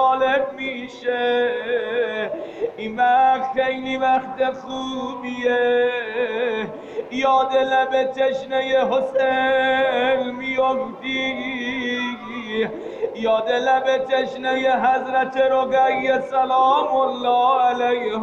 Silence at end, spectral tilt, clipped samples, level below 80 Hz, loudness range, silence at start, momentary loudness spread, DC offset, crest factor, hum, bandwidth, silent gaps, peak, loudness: 0 s; -4.5 dB/octave; under 0.1%; -60 dBFS; 4 LU; 0 s; 10 LU; under 0.1%; 14 dB; none; 7.6 kHz; none; -6 dBFS; -20 LUFS